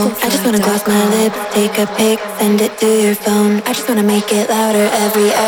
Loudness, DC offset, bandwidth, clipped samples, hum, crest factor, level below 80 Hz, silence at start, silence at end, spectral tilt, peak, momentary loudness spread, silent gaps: -13 LUFS; under 0.1%; over 20 kHz; under 0.1%; none; 12 dB; -54 dBFS; 0 s; 0 s; -4 dB/octave; 0 dBFS; 3 LU; none